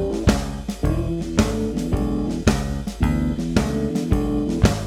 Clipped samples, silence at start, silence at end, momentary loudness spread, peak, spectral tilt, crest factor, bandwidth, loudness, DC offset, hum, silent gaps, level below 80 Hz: under 0.1%; 0 s; 0 s; 4 LU; 0 dBFS; -6.5 dB/octave; 20 dB; 16 kHz; -22 LUFS; under 0.1%; none; none; -28 dBFS